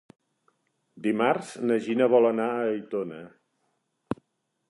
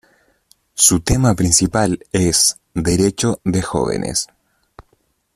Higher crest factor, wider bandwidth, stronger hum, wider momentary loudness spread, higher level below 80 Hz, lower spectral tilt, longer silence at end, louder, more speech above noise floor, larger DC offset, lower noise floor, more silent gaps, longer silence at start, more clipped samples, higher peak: about the same, 20 dB vs 18 dB; second, 11.5 kHz vs 15.5 kHz; neither; first, 16 LU vs 9 LU; second, -70 dBFS vs -36 dBFS; first, -6.5 dB/octave vs -4 dB/octave; about the same, 0.55 s vs 0.55 s; second, -26 LUFS vs -16 LUFS; first, 52 dB vs 46 dB; neither; first, -77 dBFS vs -62 dBFS; neither; first, 0.95 s vs 0.75 s; neither; second, -8 dBFS vs 0 dBFS